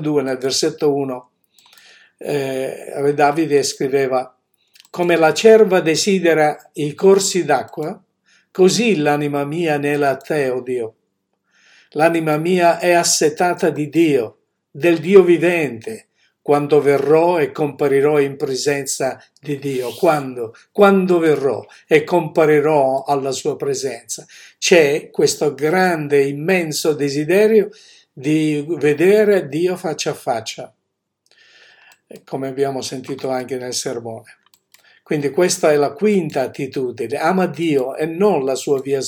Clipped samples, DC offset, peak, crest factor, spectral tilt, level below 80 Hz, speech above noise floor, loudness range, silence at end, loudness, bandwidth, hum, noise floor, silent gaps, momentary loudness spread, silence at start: under 0.1%; under 0.1%; 0 dBFS; 18 dB; -4.5 dB/octave; -68 dBFS; 58 dB; 6 LU; 0 s; -17 LUFS; 17.5 kHz; none; -75 dBFS; none; 13 LU; 0 s